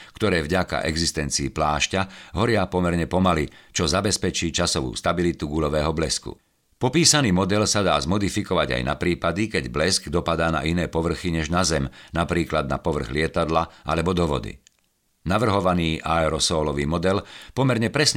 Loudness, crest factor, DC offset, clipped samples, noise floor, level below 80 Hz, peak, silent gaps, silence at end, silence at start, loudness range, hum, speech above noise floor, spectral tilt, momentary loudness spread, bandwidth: -22 LUFS; 18 dB; under 0.1%; under 0.1%; -68 dBFS; -40 dBFS; -4 dBFS; none; 0 s; 0 s; 3 LU; none; 45 dB; -4 dB/octave; 5 LU; 16 kHz